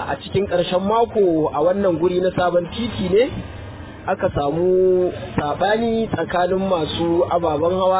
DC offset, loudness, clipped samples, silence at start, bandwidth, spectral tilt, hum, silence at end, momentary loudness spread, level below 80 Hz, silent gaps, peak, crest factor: under 0.1%; -19 LUFS; under 0.1%; 0 s; 4 kHz; -11 dB/octave; none; 0 s; 7 LU; -42 dBFS; none; -6 dBFS; 14 dB